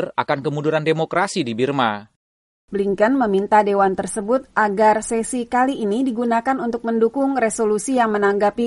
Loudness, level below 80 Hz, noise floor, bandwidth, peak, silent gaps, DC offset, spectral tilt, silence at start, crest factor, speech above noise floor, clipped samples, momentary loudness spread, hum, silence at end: -19 LUFS; -54 dBFS; under -90 dBFS; 11.5 kHz; -2 dBFS; 2.16-2.68 s; under 0.1%; -5 dB/octave; 0 s; 16 dB; over 71 dB; under 0.1%; 6 LU; none; 0 s